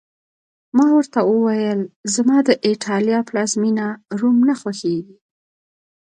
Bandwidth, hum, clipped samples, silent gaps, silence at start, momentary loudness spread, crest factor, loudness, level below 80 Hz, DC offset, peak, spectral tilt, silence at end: 10 kHz; none; under 0.1%; 1.96-2.04 s; 0.75 s; 8 LU; 18 dB; -18 LUFS; -68 dBFS; under 0.1%; -2 dBFS; -5 dB/octave; 1 s